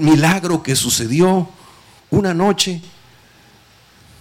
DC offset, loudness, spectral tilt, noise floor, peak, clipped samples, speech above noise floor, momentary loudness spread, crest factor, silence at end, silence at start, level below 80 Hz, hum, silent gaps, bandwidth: under 0.1%; -16 LUFS; -4.5 dB/octave; -49 dBFS; -4 dBFS; under 0.1%; 34 dB; 7 LU; 14 dB; 1.35 s; 0 s; -48 dBFS; none; none; 16.5 kHz